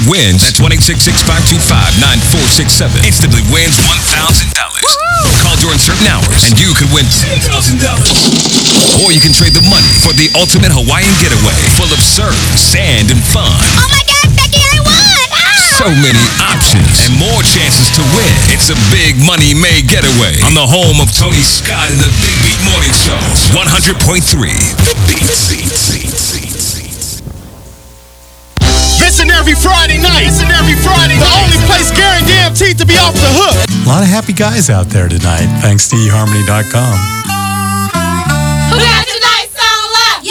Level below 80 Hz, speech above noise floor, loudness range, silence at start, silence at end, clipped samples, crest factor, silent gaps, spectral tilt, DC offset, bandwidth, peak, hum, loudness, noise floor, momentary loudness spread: -18 dBFS; 28 dB; 5 LU; 0 s; 0 s; 2%; 8 dB; none; -3 dB/octave; under 0.1%; over 20 kHz; 0 dBFS; none; -7 LUFS; -36 dBFS; 6 LU